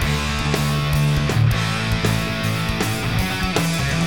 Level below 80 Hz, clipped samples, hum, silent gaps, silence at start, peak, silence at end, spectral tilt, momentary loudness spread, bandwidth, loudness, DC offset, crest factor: -30 dBFS; under 0.1%; none; none; 0 s; -2 dBFS; 0 s; -5 dB/octave; 3 LU; 19 kHz; -20 LUFS; 1%; 16 dB